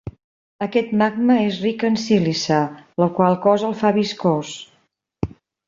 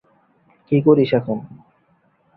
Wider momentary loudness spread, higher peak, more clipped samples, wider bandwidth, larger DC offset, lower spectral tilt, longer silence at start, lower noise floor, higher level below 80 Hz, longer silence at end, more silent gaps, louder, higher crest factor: about the same, 13 LU vs 13 LU; about the same, -2 dBFS vs -2 dBFS; neither; first, 7.8 kHz vs 4.9 kHz; neither; second, -6 dB/octave vs -11 dB/octave; second, 0.05 s vs 0.7 s; about the same, -64 dBFS vs -61 dBFS; first, -50 dBFS vs -60 dBFS; second, 0.4 s vs 0.8 s; first, 0.24-0.59 s vs none; about the same, -19 LUFS vs -18 LUFS; about the same, 18 dB vs 18 dB